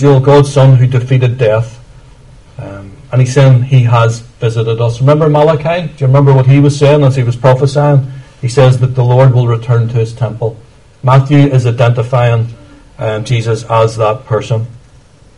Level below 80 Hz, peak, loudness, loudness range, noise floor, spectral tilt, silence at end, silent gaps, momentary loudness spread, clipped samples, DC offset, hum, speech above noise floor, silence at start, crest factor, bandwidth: -38 dBFS; 0 dBFS; -10 LUFS; 3 LU; -41 dBFS; -7.5 dB/octave; 0.6 s; none; 11 LU; 0.5%; under 0.1%; none; 33 dB; 0 s; 10 dB; 10.5 kHz